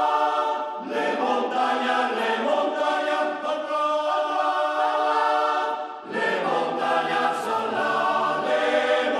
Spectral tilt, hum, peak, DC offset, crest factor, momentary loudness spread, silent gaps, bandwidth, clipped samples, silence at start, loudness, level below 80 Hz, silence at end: -3.5 dB/octave; none; -10 dBFS; under 0.1%; 14 dB; 5 LU; none; 12.5 kHz; under 0.1%; 0 s; -23 LUFS; -74 dBFS; 0 s